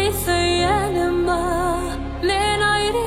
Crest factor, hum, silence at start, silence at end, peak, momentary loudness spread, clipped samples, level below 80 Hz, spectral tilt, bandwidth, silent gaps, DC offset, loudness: 12 dB; none; 0 s; 0 s; -8 dBFS; 6 LU; under 0.1%; -32 dBFS; -4 dB/octave; 16.5 kHz; none; under 0.1%; -20 LUFS